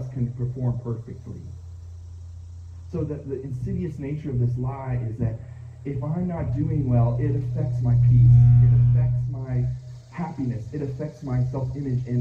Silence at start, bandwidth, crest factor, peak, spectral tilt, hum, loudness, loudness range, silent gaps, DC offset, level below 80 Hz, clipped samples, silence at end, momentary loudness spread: 0 s; 2.6 kHz; 16 dB; -6 dBFS; -11 dB/octave; none; -23 LUFS; 13 LU; none; under 0.1%; -38 dBFS; under 0.1%; 0 s; 24 LU